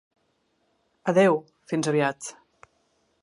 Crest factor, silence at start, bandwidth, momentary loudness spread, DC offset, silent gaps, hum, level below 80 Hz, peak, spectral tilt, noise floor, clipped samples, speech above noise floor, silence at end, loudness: 20 dB; 1.05 s; 11.5 kHz; 15 LU; under 0.1%; none; none; -76 dBFS; -8 dBFS; -5.5 dB/octave; -71 dBFS; under 0.1%; 48 dB; 0.9 s; -24 LUFS